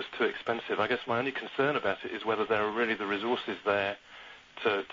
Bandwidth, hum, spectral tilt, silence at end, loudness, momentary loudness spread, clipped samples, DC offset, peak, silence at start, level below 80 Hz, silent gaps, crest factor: 7.6 kHz; none; -5.5 dB/octave; 0.05 s; -31 LUFS; 6 LU; under 0.1%; under 0.1%; -14 dBFS; 0 s; -70 dBFS; none; 18 dB